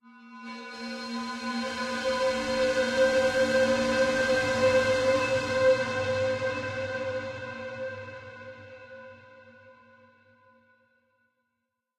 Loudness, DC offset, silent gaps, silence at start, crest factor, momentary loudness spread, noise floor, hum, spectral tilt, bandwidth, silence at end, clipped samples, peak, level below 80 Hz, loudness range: -27 LUFS; under 0.1%; none; 0.05 s; 18 dB; 20 LU; -82 dBFS; none; -4 dB/octave; 12 kHz; 2.25 s; under 0.1%; -12 dBFS; -58 dBFS; 17 LU